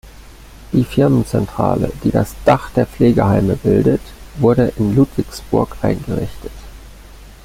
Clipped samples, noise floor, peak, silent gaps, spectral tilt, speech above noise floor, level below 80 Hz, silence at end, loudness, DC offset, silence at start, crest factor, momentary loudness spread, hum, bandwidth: under 0.1%; -38 dBFS; 0 dBFS; none; -8 dB/octave; 23 dB; -34 dBFS; 0.15 s; -16 LUFS; under 0.1%; 0.05 s; 16 dB; 9 LU; none; 16.5 kHz